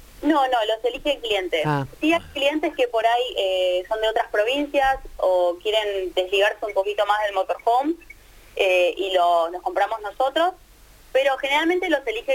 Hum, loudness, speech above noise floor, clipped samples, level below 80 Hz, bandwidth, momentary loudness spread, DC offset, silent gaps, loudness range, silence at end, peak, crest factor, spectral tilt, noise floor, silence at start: none; -22 LUFS; 28 dB; under 0.1%; -48 dBFS; 17 kHz; 5 LU; under 0.1%; none; 1 LU; 0 s; -6 dBFS; 16 dB; -4.5 dB/octave; -49 dBFS; 0.2 s